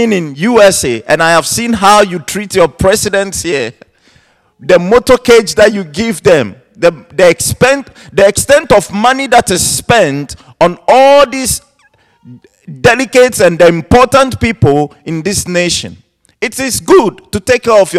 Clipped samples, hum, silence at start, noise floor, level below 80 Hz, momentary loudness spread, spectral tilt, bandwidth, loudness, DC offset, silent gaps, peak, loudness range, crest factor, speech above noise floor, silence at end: 2%; none; 0 s; -51 dBFS; -34 dBFS; 9 LU; -4 dB/octave; 15.5 kHz; -9 LUFS; under 0.1%; none; 0 dBFS; 3 LU; 10 dB; 42 dB; 0 s